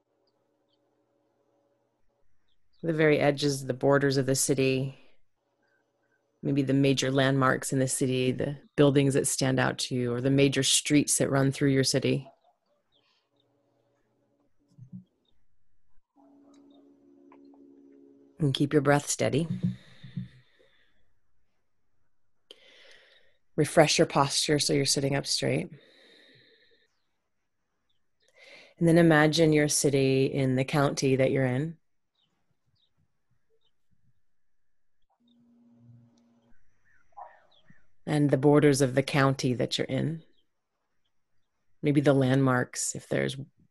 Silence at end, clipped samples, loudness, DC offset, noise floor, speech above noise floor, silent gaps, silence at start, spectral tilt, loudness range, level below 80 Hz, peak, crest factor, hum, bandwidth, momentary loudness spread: 0.25 s; under 0.1%; -25 LUFS; under 0.1%; -84 dBFS; 59 dB; none; 2.85 s; -4.5 dB/octave; 9 LU; -62 dBFS; -4 dBFS; 24 dB; none; 13 kHz; 11 LU